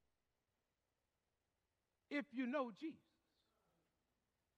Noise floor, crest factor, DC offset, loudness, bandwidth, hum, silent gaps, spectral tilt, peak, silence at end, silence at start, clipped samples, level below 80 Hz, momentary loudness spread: under -90 dBFS; 22 dB; under 0.1%; -46 LUFS; 8.6 kHz; none; none; -5.5 dB/octave; -30 dBFS; 1.6 s; 2.1 s; under 0.1%; under -90 dBFS; 10 LU